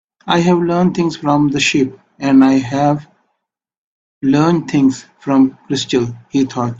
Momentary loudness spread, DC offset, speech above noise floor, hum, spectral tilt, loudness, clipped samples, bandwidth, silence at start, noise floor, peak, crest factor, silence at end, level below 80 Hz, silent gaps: 8 LU; under 0.1%; 61 dB; none; -6 dB/octave; -15 LUFS; under 0.1%; 7.8 kHz; 0.25 s; -75 dBFS; 0 dBFS; 14 dB; 0 s; -52 dBFS; 3.77-4.21 s